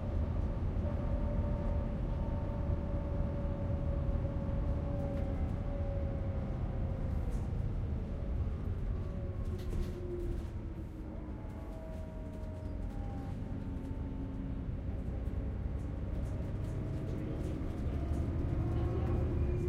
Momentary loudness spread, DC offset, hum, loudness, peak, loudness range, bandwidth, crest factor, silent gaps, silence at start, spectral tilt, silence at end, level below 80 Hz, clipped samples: 7 LU; under 0.1%; none; -38 LUFS; -22 dBFS; 6 LU; 7.6 kHz; 14 dB; none; 0 s; -9.5 dB/octave; 0 s; -38 dBFS; under 0.1%